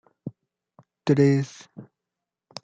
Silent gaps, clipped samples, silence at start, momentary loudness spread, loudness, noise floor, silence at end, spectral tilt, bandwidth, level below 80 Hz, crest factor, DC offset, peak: none; under 0.1%; 0.25 s; 24 LU; -23 LUFS; -86 dBFS; 0.8 s; -7.5 dB/octave; 7.8 kHz; -68 dBFS; 18 dB; under 0.1%; -8 dBFS